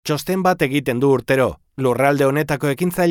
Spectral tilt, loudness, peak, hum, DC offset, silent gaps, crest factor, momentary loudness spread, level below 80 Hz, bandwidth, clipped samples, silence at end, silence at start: -6 dB/octave; -18 LUFS; -4 dBFS; none; under 0.1%; none; 14 dB; 5 LU; -48 dBFS; 19 kHz; under 0.1%; 0 s; 0.05 s